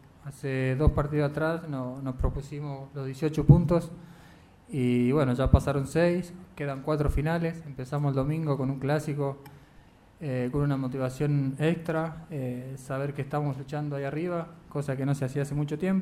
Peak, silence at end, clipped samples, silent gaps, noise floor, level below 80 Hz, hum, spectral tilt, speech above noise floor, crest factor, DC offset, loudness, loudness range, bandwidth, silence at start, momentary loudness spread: -2 dBFS; 0 s; under 0.1%; none; -55 dBFS; -40 dBFS; none; -8 dB/octave; 27 dB; 24 dB; under 0.1%; -29 LUFS; 6 LU; 13 kHz; 0.25 s; 12 LU